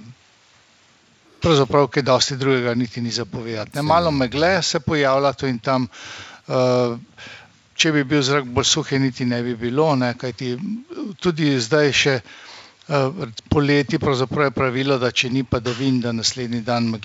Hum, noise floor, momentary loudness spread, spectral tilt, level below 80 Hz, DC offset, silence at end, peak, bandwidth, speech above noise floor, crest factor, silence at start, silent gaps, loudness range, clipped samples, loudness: none; -55 dBFS; 12 LU; -4.5 dB/octave; -48 dBFS; under 0.1%; 0 s; -2 dBFS; 11.5 kHz; 35 dB; 18 dB; 0 s; none; 2 LU; under 0.1%; -20 LUFS